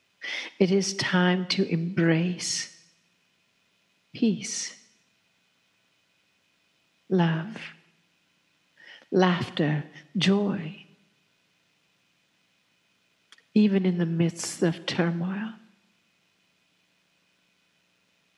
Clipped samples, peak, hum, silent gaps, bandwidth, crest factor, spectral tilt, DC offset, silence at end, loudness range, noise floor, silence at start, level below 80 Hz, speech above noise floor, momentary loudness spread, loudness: under 0.1%; -8 dBFS; none; none; 12 kHz; 22 dB; -5 dB/octave; under 0.1%; 2.8 s; 8 LU; -69 dBFS; 0.2 s; -78 dBFS; 44 dB; 15 LU; -26 LUFS